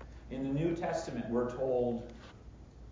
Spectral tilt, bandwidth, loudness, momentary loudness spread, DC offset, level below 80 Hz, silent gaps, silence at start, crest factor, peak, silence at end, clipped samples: -7 dB/octave; 7.6 kHz; -35 LUFS; 21 LU; under 0.1%; -54 dBFS; none; 0 s; 14 dB; -22 dBFS; 0 s; under 0.1%